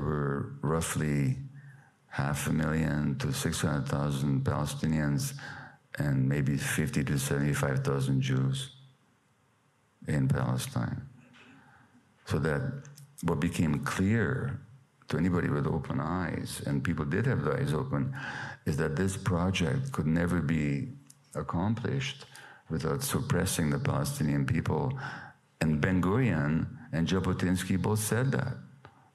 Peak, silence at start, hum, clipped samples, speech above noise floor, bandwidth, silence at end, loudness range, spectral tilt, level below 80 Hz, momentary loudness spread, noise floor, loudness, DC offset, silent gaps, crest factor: -8 dBFS; 0 s; none; under 0.1%; 39 dB; 14 kHz; 0.25 s; 4 LU; -6 dB/octave; -50 dBFS; 10 LU; -68 dBFS; -30 LUFS; under 0.1%; none; 22 dB